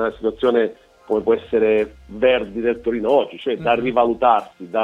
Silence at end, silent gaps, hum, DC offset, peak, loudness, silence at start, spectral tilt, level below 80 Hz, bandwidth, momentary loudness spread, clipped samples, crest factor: 0 s; none; none; under 0.1%; -2 dBFS; -19 LUFS; 0 s; -7 dB/octave; -48 dBFS; 5.2 kHz; 7 LU; under 0.1%; 18 dB